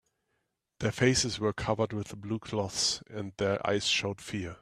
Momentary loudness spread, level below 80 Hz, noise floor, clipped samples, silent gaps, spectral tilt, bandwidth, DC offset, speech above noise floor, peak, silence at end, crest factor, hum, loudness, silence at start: 11 LU; -56 dBFS; -80 dBFS; under 0.1%; none; -3.5 dB/octave; 14 kHz; under 0.1%; 49 dB; -10 dBFS; 0.05 s; 22 dB; none; -30 LUFS; 0.8 s